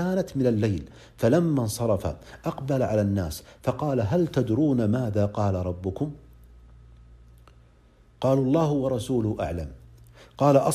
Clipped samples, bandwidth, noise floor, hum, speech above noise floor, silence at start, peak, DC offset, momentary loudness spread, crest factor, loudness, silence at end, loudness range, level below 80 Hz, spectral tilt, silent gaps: under 0.1%; 14.5 kHz; -56 dBFS; none; 32 dB; 0 s; -4 dBFS; under 0.1%; 11 LU; 22 dB; -25 LUFS; 0 s; 5 LU; -48 dBFS; -7.5 dB/octave; none